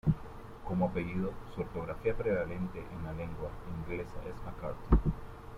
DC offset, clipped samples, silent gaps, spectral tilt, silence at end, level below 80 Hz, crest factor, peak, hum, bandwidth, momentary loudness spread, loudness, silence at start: under 0.1%; under 0.1%; none; -9 dB/octave; 0 s; -40 dBFS; 24 dB; -12 dBFS; none; 12 kHz; 12 LU; -36 LUFS; 0.05 s